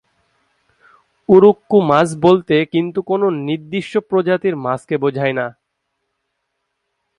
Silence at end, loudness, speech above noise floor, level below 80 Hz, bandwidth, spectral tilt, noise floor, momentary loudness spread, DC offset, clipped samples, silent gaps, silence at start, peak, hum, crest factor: 1.65 s; -16 LUFS; 58 dB; -58 dBFS; 11 kHz; -7 dB/octave; -73 dBFS; 12 LU; under 0.1%; under 0.1%; none; 1.3 s; 0 dBFS; none; 16 dB